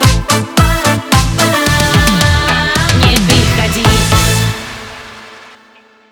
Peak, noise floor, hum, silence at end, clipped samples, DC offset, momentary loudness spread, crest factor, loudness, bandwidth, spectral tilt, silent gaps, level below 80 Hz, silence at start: 0 dBFS; -44 dBFS; none; 0.65 s; under 0.1%; under 0.1%; 13 LU; 12 dB; -10 LUFS; over 20 kHz; -4 dB/octave; none; -20 dBFS; 0 s